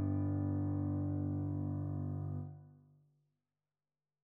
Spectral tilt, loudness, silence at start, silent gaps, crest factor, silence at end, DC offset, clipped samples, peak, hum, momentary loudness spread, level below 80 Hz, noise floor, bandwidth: -13.5 dB/octave; -38 LUFS; 0 s; none; 12 dB; 1.55 s; under 0.1%; under 0.1%; -26 dBFS; none; 8 LU; -74 dBFS; under -90 dBFS; 1.9 kHz